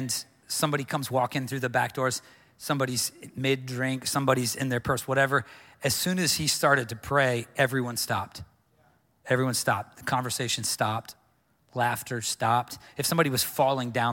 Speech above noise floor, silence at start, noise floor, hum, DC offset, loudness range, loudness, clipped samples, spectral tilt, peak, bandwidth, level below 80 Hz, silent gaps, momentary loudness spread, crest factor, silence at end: 40 dB; 0 s; -67 dBFS; none; under 0.1%; 4 LU; -27 LUFS; under 0.1%; -3.5 dB/octave; -8 dBFS; 17 kHz; -60 dBFS; none; 7 LU; 20 dB; 0 s